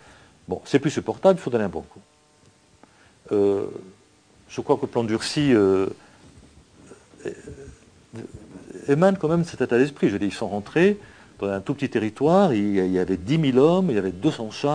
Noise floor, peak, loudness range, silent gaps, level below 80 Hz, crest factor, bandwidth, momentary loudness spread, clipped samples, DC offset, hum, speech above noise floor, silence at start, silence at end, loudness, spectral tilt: -57 dBFS; -4 dBFS; 7 LU; none; -56 dBFS; 20 dB; 10 kHz; 20 LU; under 0.1%; under 0.1%; none; 35 dB; 0.5 s; 0 s; -22 LUFS; -6.5 dB/octave